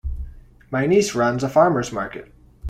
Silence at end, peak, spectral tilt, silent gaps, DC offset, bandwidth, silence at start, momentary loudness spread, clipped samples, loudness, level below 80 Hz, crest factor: 0 s; -4 dBFS; -5.5 dB/octave; none; under 0.1%; 15.5 kHz; 0.05 s; 19 LU; under 0.1%; -20 LUFS; -36 dBFS; 18 dB